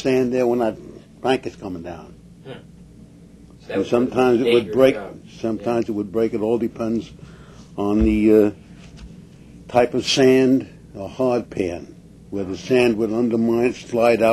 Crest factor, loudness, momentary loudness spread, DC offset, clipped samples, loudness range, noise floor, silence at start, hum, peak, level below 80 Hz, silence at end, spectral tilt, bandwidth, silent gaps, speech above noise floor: 20 dB; -20 LUFS; 20 LU; under 0.1%; under 0.1%; 6 LU; -45 dBFS; 0 s; none; 0 dBFS; -42 dBFS; 0 s; -6 dB/octave; 13.5 kHz; none; 26 dB